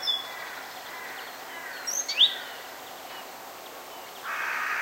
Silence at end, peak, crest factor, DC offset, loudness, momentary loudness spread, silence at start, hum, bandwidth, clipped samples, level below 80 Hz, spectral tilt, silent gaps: 0 s; -10 dBFS; 22 dB; under 0.1%; -28 LUFS; 20 LU; 0 s; none; 16 kHz; under 0.1%; -76 dBFS; 2 dB/octave; none